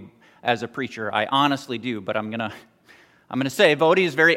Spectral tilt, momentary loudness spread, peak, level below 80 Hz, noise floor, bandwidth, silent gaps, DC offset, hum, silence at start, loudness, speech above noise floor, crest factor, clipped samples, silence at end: -4.5 dB/octave; 13 LU; -4 dBFS; -72 dBFS; -54 dBFS; 16.5 kHz; none; under 0.1%; none; 0 s; -22 LUFS; 32 dB; 20 dB; under 0.1%; 0 s